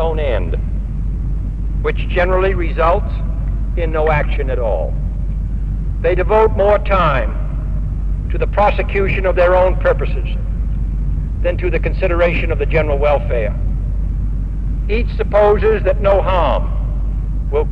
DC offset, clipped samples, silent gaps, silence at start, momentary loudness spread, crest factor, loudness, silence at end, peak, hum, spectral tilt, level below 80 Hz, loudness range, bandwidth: 2%; under 0.1%; none; 0 s; 9 LU; 14 dB; -17 LUFS; 0 s; -2 dBFS; none; -8.5 dB/octave; -18 dBFS; 2 LU; 4.6 kHz